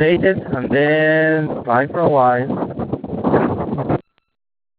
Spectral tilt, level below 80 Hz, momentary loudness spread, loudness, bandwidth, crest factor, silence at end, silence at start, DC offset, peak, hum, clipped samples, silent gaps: -12 dB/octave; -46 dBFS; 9 LU; -17 LUFS; 4.9 kHz; 16 dB; 0.8 s; 0 s; under 0.1%; 0 dBFS; none; under 0.1%; none